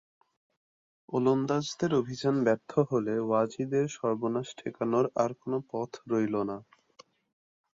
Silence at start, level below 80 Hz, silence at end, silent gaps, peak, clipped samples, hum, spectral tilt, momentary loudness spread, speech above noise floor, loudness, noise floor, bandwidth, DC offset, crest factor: 1.1 s; -70 dBFS; 1.15 s; none; -12 dBFS; under 0.1%; none; -6.5 dB/octave; 8 LU; 31 dB; -30 LUFS; -60 dBFS; 7.8 kHz; under 0.1%; 18 dB